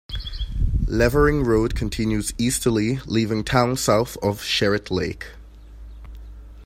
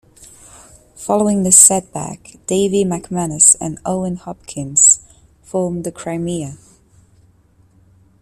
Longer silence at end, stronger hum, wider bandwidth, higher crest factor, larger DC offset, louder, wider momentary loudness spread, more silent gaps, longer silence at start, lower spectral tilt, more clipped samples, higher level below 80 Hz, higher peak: second, 0 s vs 1.65 s; neither; about the same, 16 kHz vs 16 kHz; about the same, 18 dB vs 18 dB; neither; second, -22 LUFS vs -13 LUFS; about the same, 18 LU vs 20 LU; neither; about the same, 0.1 s vs 0.2 s; about the same, -5 dB/octave vs -4 dB/octave; neither; first, -30 dBFS vs -50 dBFS; second, -4 dBFS vs 0 dBFS